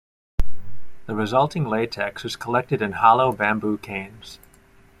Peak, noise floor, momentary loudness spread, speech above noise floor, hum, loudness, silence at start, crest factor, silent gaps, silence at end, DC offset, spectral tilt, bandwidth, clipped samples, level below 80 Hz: -2 dBFS; -53 dBFS; 20 LU; 31 dB; none; -22 LUFS; 0.4 s; 18 dB; none; 0.65 s; under 0.1%; -6 dB/octave; 14.5 kHz; under 0.1%; -38 dBFS